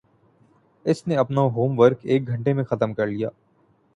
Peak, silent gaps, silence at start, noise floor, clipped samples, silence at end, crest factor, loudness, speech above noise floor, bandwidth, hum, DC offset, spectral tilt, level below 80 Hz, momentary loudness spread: -2 dBFS; none; 0.85 s; -62 dBFS; under 0.1%; 0.65 s; 20 dB; -22 LUFS; 41 dB; 11 kHz; none; under 0.1%; -8 dB/octave; -60 dBFS; 9 LU